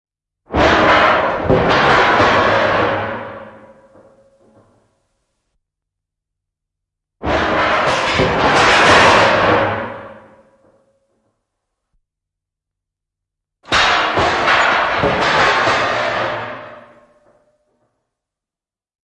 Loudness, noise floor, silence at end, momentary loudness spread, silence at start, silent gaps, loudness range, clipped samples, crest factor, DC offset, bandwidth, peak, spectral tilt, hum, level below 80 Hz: -13 LUFS; under -90 dBFS; 2.3 s; 15 LU; 0.5 s; none; 12 LU; under 0.1%; 16 dB; under 0.1%; 11.5 kHz; 0 dBFS; -4 dB/octave; none; -40 dBFS